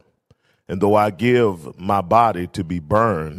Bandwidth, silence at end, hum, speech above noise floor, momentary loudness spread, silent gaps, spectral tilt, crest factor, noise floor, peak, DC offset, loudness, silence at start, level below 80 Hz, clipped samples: 15.5 kHz; 0 s; none; 42 dB; 10 LU; none; -7.5 dB/octave; 18 dB; -60 dBFS; -2 dBFS; under 0.1%; -18 LUFS; 0.7 s; -48 dBFS; under 0.1%